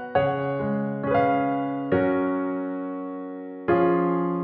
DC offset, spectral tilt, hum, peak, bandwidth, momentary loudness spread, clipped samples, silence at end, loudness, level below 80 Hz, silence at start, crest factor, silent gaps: under 0.1%; -11 dB/octave; none; -10 dBFS; 4.6 kHz; 11 LU; under 0.1%; 0 s; -25 LUFS; -58 dBFS; 0 s; 14 dB; none